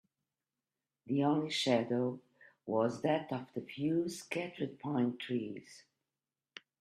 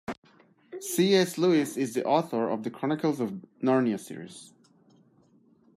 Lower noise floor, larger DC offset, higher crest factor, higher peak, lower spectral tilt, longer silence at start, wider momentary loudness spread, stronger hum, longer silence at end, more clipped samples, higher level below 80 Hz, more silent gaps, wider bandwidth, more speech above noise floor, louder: first, under -90 dBFS vs -62 dBFS; neither; about the same, 20 dB vs 18 dB; second, -18 dBFS vs -10 dBFS; about the same, -5.5 dB/octave vs -5 dB/octave; first, 1.05 s vs 0.1 s; about the same, 18 LU vs 19 LU; neither; second, 1 s vs 1.3 s; neither; second, -80 dBFS vs -74 dBFS; second, none vs 0.18-0.22 s; second, 13 kHz vs 15.5 kHz; first, over 55 dB vs 35 dB; second, -35 LUFS vs -27 LUFS